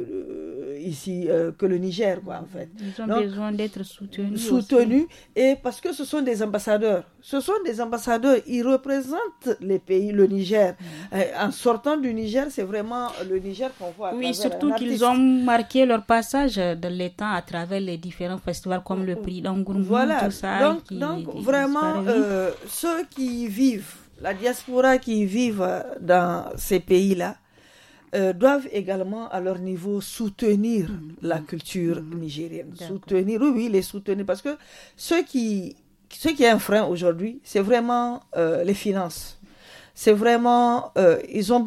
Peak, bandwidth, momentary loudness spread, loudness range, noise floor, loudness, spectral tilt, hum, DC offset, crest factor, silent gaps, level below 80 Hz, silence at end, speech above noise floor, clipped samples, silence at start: -4 dBFS; 16 kHz; 12 LU; 5 LU; -53 dBFS; -23 LUFS; -5.5 dB/octave; none; under 0.1%; 20 dB; none; -52 dBFS; 0 s; 30 dB; under 0.1%; 0 s